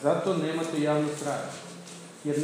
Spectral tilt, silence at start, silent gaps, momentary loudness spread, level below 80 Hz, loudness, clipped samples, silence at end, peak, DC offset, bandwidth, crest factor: -5.5 dB/octave; 0 s; none; 16 LU; -84 dBFS; -29 LUFS; under 0.1%; 0 s; -12 dBFS; under 0.1%; 15.5 kHz; 16 dB